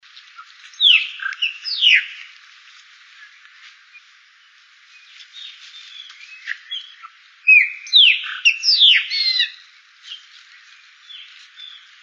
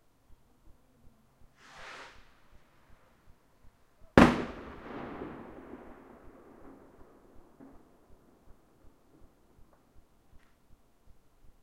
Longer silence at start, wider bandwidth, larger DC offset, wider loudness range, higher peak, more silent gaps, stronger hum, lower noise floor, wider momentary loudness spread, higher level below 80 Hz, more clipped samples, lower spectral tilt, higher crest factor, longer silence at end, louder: second, 0.4 s vs 1.8 s; second, 7.8 kHz vs 15 kHz; neither; second, 21 LU vs 24 LU; about the same, -2 dBFS vs 0 dBFS; neither; neither; second, -51 dBFS vs -60 dBFS; second, 27 LU vs 33 LU; second, under -90 dBFS vs -50 dBFS; neither; second, 10 dB/octave vs -6.5 dB/octave; second, 20 dB vs 36 dB; second, 0.35 s vs 5.85 s; first, -13 LUFS vs -28 LUFS